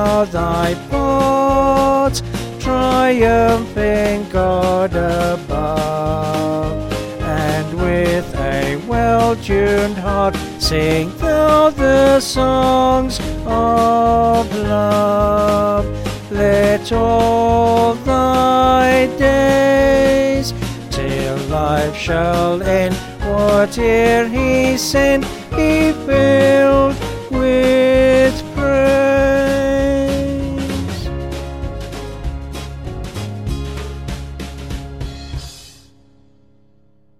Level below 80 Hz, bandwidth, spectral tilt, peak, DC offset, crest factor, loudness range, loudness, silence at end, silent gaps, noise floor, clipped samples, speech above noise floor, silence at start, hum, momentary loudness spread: -28 dBFS; 16.5 kHz; -5.5 dB/octave; 0 dBFS; under 0.1%; 14 dB; 12 LU; -15 LUFS; 1.5 s; none; -56 dBFS; under 0.1%; 42 dB; 0 s; none; 14 LU